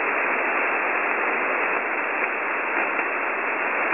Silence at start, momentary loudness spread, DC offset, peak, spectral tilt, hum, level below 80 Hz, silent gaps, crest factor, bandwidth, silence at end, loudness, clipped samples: 0 s; 2 LU; 0.2%; -6 dBFS; -0.5 dB/octave; none; -76 dBFS; none; 18 dB; 3.7 kHz; 0 s; -22 LUFS; under 0.1%